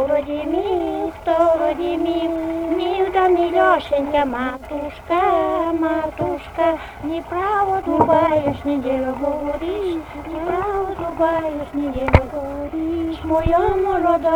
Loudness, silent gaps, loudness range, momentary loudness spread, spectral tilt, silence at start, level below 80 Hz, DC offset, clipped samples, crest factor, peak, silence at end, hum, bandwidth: -20 LUFS; none; 3 LU; 9 LU; -7.5 dB/octave; 0 s; -36 dBFS; under 0.1%; under 0.1%; 18 dB; 0 dBFS; 0 s; none; 19.5 kHz